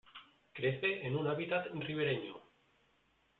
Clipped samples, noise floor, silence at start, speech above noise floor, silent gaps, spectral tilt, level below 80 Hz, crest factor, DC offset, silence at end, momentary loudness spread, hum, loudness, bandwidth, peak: under 0.1%; -74 dBFS; 0.15 s; 38 dB; none; -4 dB/octave; -74 dBFS; 18 dB; under 0.1%; 0.95 s; 20 LU; none; -36 LUFS; 4.5 kHz; -20 dBFS